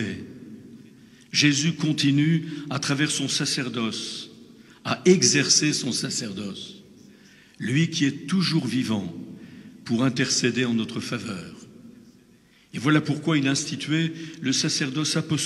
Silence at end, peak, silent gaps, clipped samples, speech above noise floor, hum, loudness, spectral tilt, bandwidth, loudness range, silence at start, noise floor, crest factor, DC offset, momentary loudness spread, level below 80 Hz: 0 s; -4 dBFS; none; under 0.1%; 33 dB; none; -23 LUFS; -4 dB/octave; 13 kHz; 5 LU; 0 s; -56 dBFS; 20 dB; under 0.1%; 19 LU; -68 dBFS